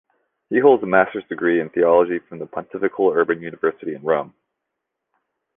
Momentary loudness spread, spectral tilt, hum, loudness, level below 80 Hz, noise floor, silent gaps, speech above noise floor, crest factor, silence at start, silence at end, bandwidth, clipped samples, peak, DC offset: 13 LU; -9.5 dB/octave; none; -19 LUFS; -62 dBFS; -80 dBFS; none; 61 dB; 18 dB; 0.5 s; 1.3 s; 3.7 kHz; under 0.1%; -2 dBFS; under 0.1%